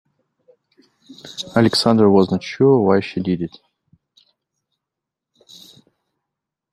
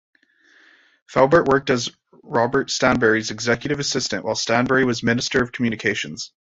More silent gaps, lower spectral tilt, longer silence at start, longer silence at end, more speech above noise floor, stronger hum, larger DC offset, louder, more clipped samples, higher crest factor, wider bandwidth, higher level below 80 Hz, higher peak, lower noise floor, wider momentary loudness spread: neither; first, -6.5 dB/octave vs -4 dB/octave; about the same, 1.1 s vs 1.1 s; first, 3.25 s vs 0.2 s; first, 67 dB vs 36 dB; neither; neither; first, -16 LUFS vs -20 LUFS; neither; about the same, 18 dB vs 20 dB; first, 13.5 kHz vs 8 kHz; second, -60 dBFS vs -50 dBFS; about the same, -2 dBFS vs -2 dBFS; first, -84 dBFS vs -56 dBFS; first, 15 LU vs 7 LU